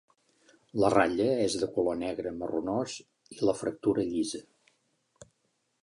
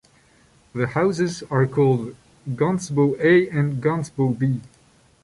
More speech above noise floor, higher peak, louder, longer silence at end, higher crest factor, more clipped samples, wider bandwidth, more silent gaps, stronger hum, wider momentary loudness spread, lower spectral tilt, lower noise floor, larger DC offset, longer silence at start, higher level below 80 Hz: first, 48 dB vs 36 dB; second, -10 dBFS vs -6 dBFS; second, -30 LUFS vs -21 LUFS; about the same, 0.6 s vs 0.55 s; first, 22 dB vs 16 dB; neither; about the same, 11.5 kHz vs 11.5 kHz; neither; neither; about the same, 13 LU vs 13 LU; second, -5 dB/octave vs -7 dB/octave; first, -76 dBFS vs -56 dBFS; neither; about the same, 0.75 s vs 0.75 s; second, -62 dBFS vs -56 dBFS